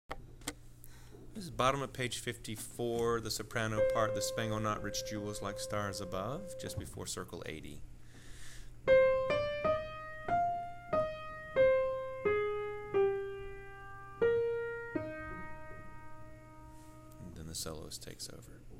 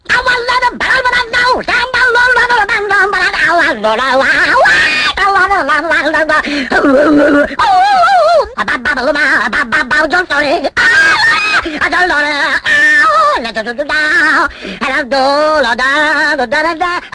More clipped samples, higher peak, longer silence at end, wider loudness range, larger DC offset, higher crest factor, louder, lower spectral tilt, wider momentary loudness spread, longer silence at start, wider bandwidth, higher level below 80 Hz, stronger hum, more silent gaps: neither; second, -16 dBFS vs 0 dBFS; about the same, 0 s vs 0.05 s; first, 9 LU vs 1 LU; neither; first, 20 dB vs 10 dB; second, -35 LUFS vs -9 LUFS; first, -4.5 dB/octave vs -3 dB/octave; first, 22 LU vs 6 LU; about the same, 0.1 s vs 0.1 s; first, 16 kHz vs 10.5 kHz; second, -54 dBFS vs -38 dBFS; neither; neither